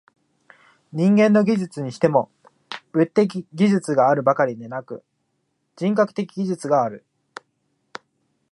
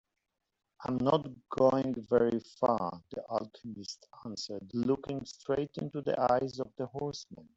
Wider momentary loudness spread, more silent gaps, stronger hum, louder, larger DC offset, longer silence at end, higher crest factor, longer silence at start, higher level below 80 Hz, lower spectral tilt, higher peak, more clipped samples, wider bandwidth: first, 20 LU vs 15 LU; neither; neither; first, -20 LUFS vs -33 LUFS; neither; first, 1.55 s vs 0.15 s; about the same, 20 dB vs 20 dB; first, 0.95 s vs 0.8 s; about the same, -70 dBFS vs -66 dBFS; about the same, -7.5 dB/octave vs -6.5 dB/octave; first, -2 dBFS vs -12 dBFS; neither; first, 11 kHz vs 8 kHz